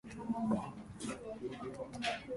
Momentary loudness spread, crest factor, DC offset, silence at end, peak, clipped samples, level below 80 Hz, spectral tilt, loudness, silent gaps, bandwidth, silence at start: 9 LU; 18 dB; under 0.1%; 0 s; -22 dBFS; under 0.1%; -64 dBFS; -5 dB/octave; -41 LUFS; none; 11.5 kHz; 0.05 s